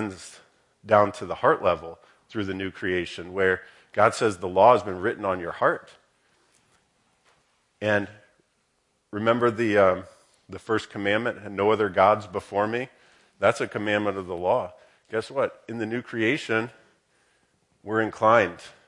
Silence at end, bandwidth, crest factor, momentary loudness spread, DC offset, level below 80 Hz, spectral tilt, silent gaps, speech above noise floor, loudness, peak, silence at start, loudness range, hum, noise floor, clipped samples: 0.2 s; 11.5 kHz; 22 dB; 13 LU; under 0.1%; -68 dBFS; -5.5 dB/octave; none; 47 dB; -24 LUFS; -4 dBFS; 0 s; 6 LU; none; -71 dBFS; under 0.1%